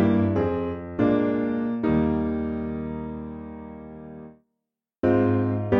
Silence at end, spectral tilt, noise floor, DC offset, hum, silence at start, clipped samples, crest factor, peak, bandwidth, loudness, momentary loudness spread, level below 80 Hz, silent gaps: 0 s; -10.5 dB/octave; -83 dBFS; under 0.1%; none; 0 s; under 0.1%; 16 dB; -8 dBFS; 5.2 kHz; -25 LUFS; 19 LU; -44 dBFS; none